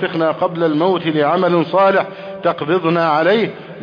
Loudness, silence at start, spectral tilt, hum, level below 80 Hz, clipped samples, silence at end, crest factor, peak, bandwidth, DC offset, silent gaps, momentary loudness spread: -16 LUFS; 0 s; -8.5 dB/octave; none; -64 dBFS; under 0.1%; 0 s; 12 dB; -4 dBFS; 5.2 kHz; under 0.1%; none; 7 LU